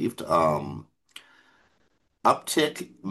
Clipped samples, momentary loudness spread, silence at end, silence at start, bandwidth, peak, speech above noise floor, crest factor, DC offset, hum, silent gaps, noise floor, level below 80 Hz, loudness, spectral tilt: under 0.1%; 17 LU; 0 s; 0 s; 12.5 kHz; -6 dBFS; 44 dB; 22 dB; under 0.1%; none; none; -70 dBFS; -64 dBFS; -25 LUFS; -4.5 dB/octave